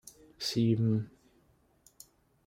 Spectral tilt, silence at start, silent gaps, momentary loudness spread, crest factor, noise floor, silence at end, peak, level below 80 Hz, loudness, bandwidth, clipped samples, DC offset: -6.5 dB/octave; 0.4 s; none; 19 LU; 18 dB; -68 dBFS; 1.4 s; -16 dBFS; -68 dBFS; -31 LUFS; 16 kHz; under 0.1%; under 0.1%